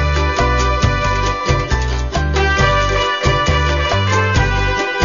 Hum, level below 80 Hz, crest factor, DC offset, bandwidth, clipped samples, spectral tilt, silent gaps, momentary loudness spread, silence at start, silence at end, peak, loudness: none; -20 dBFS; 14 dB; 0.4%; 7.4 kHz; under 0.1%; -5 dB/octave; none; 4 LU; 0 s; 0 s; 0 dBFS; -15 LUFS